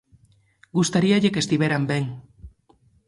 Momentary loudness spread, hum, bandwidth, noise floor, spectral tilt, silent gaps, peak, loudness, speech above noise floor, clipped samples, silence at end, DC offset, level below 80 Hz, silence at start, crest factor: 11 LU; none; 11.5 kHz; -60 dBFS; -5.5 dB/octave; none; -6 dBFS; -22 LUFS; 39 dB; under 0.1%; 0.6 s; under 0.1%; -54 dBFS; 0.75 s; 16 dB